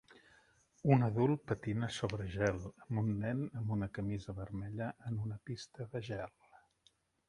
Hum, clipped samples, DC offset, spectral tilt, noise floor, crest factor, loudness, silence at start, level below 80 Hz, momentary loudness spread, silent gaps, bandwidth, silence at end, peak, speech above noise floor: none; under 0.1%; under 0.1%; -7.5 dB/octave; -74 dBFS; 24 dB; -38 LUFS; 0.1 s; -60 dBFS; 13 LU; none; 11 kHz; 0.75 s; -14 dBFS; 37 dB